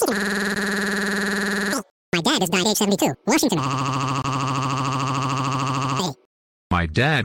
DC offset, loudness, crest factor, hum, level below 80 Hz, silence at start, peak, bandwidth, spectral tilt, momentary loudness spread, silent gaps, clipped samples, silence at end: under 0.1%; -22 LUFS; 14 dB; none; -46 dBFS; 0 s; -10 dBFS; 17 kHz; -4 dB/octave; 5 LU; 1.91-2.12 s, 6.26-6.70 s; under 0.1%; 0 s